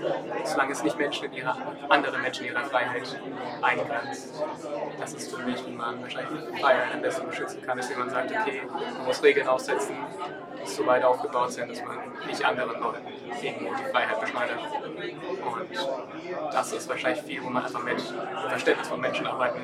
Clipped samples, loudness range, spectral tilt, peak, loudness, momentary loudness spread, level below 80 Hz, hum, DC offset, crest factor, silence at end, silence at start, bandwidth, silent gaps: under 0.1%; 4 LU; -3.5 dB/octave; -4 dBFS; -28 LUFS; 11 LU; -76 dBFS; none; under 0.1%; 24 dB; 0 s; 0 s; 15 kHz; none